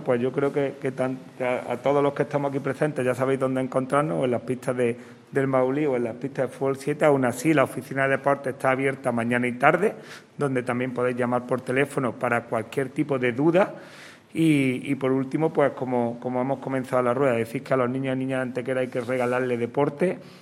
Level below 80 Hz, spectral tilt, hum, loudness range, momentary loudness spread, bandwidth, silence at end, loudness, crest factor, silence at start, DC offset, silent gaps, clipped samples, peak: -68 dBFS; -7 dB/octave; none; 2 LU; 7 LU; 15.5 kHz; 0.05 s; -25 LUFS; 22 dB; 0 s; under 0.1%; none; under 0.1%; -2 dBFS